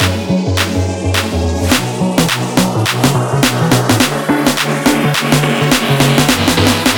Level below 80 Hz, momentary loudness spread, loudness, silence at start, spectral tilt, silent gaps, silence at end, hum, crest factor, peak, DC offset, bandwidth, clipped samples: -32 dBFS; 4 LU; -12 LUFS; 0 s; -4.5 dB/octave; none; 0 s; none; 12 dB; 0 dBFS; under 0.1%; 20 kHz; under 0.1%